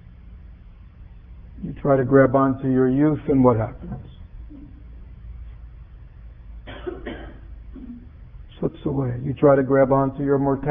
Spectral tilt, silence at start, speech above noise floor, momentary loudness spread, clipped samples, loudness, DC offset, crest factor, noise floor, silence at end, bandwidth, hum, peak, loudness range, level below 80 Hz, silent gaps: -12.5 dB/octave; 0.25 s; 25 dB; 25 LU; under 0.1%; -20 LUFS; under 0.1%; 20 dB; -44 dBFS; 0 s; 3.7 kHz; none; -4 dBFS; 19 LU; -42 dBFS; none